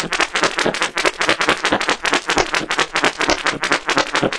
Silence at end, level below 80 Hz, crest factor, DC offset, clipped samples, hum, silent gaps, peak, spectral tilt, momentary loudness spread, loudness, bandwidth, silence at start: 0 s; -44 dBFS; 18 dB; 0.4%; under 0.1%; none; none; 0 dBFS; -2 dB/octave; 2 LU; -17 LUFS; 11 kHz; 0 s